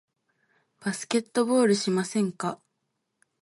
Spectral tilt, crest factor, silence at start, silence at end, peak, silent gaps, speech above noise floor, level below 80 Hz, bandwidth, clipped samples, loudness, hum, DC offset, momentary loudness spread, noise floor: -4.5 dB/octave; 20 dB; 0.85 s; 0.85 s; -8 dBFS; none; 54 dB; -76 dBFS; 11.5 kHz; under 0.1%; -26 LUFS; none; under 0.1%; 11 LU; -79 dBFS